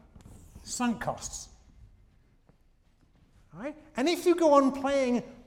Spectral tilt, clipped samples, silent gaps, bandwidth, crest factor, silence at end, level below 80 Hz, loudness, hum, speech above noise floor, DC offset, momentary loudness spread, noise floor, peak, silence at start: -4 dB/octave; under 0.1%; none; 16.5 kHz; 20 dB; 0.1 s; -56 dBFS; -27 LUFS; none; 36 dB; under 0.1%; 19 LU; -64 dBFS; -10 dBFS; 0.3 s